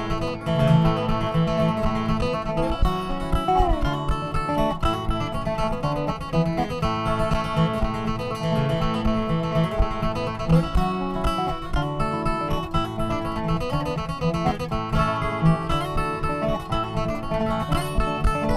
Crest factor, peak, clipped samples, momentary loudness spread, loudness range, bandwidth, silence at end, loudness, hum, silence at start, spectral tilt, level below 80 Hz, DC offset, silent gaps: 16 dB; -8 dBFS; under 0.1%; 5 LU; 2 LU; 13.5 kHz; 0 s; -24 LUFS; none; 0 s; -7 dB/octave; -30 dBFS; under 0.1%; none